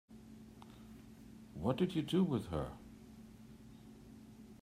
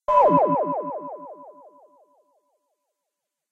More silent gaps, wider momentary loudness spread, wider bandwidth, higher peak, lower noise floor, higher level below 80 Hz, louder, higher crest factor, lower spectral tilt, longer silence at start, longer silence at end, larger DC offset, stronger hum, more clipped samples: neither; about the same, 22 LU vs 24 LU; first, 15 kHz vs 7 kHz; second, -22 dBFS vs -6 dBFS; second, -57 dBFS vs -83 dBFS; about the same, -62 dBFS vs -60 dBFS; second, -37 LUFS vs -21 LUFS; about the same, 20 dB vs 20 dB; second, -7.5 dB/octave vs -9 dB/octave; about the same, 0.1 s vs 0.1 s; second, 0.05 s vs 2 s; neither; neither; neither